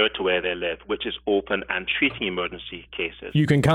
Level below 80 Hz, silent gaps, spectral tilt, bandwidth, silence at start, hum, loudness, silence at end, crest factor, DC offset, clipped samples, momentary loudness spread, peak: -50 dBFS; none; -6 dB/octave; 12 kHz; 0 s; none; -25 LUFS; 0 s; 20 dB; under 0.1%; under 0.1%; 9 LU; -4 dBFS